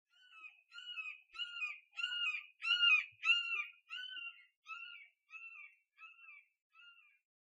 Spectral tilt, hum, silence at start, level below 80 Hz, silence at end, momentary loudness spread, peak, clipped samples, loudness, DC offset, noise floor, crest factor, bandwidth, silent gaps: 4.5 dB/octave; none; 0.3 s; under -90 dBFS; 0.55 s; 25 LU; -22 dBFS; under 0.1%; -36 LUFS; under 0.1%; -64 dBFS; 20 dB; 10.5 kHz; 4.57-4.62 s, 6.62-6.70 s